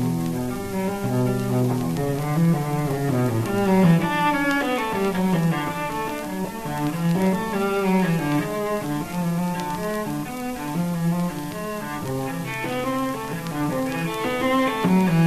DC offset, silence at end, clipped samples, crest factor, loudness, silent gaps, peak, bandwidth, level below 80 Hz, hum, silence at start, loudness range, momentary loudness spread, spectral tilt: 0.3%; 0 s; under 0.1%; 16 dB; -23 LUFS; none; -6 dBFS; 14 kHz; -48 dBFS; none; 0 s; 5 LU; 8 LU; -6.5 dB/octave